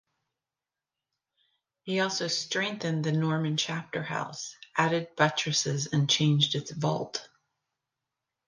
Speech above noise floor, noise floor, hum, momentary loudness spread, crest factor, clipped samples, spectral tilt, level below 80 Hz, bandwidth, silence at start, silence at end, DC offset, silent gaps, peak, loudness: over 62 dB; under -90 dBFS; none; 10 LU; 20 dB; under 0.1%; -4 dB/octave; -72 dBFS; 10 kHz; 1.85 s; 1.2 s; under 0.1%; none; -10 dBFS; -28 LUFS